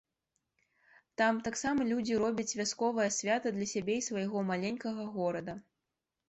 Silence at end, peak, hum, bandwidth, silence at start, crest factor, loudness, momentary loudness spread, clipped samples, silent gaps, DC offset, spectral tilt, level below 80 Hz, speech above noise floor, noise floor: 0.7 s; -18 dBFS; none; 8.2 kHz; 1.2 s; 16 dB; -33 LUFS; 7 LU; under 0.1%; none; under 0.1%; -4 dB/octave; -70 dBFS; 55 dB; -88 dBFS